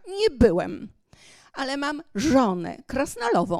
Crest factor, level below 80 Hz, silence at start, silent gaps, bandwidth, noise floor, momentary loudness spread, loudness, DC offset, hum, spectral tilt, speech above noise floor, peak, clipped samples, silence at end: 20 dB; -42 dBFS; 0.05 s; none; 14 kHz; -53 dBFS; 14 LU; -24 LUFS; under 0.1%; none; -5.5 dB/octave; 30 dB; -4 dBFS; under 0.1%; 0 s